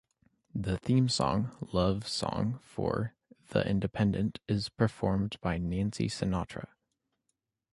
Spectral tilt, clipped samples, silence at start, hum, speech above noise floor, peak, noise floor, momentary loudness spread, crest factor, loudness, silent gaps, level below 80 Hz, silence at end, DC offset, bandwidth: -6 dB/octave; under 0.1%; 0.55 s; none; 52 dB; -12 dBFS; -83 dBFS; 7 LU; 20 dB; -32 LUFS; none; -50 dBFS; 1.1 s; under 0.1%; 11.5 kHz